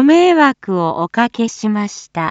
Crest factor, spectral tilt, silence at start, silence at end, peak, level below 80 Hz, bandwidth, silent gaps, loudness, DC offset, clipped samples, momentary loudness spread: 14 dB; -5.5 dB/octave; 0 s; 0 s; 0 dBFS; -62 dBFS; 8 kHz; none; -15 LUFS; under 0.1%; under 0.1%; 11 LU